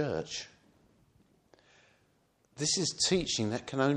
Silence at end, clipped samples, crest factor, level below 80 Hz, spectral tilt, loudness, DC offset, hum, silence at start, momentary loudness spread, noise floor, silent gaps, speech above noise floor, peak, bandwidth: 0 s; under 0.1%; 22 dB; -62 dBFS; -3.5 dB/octave; -31 LUFS; under 0.1%; none; 0 s; 12 LU; -71 dBFS; none; 39 dB; -14 dBFS; 11.5 kHz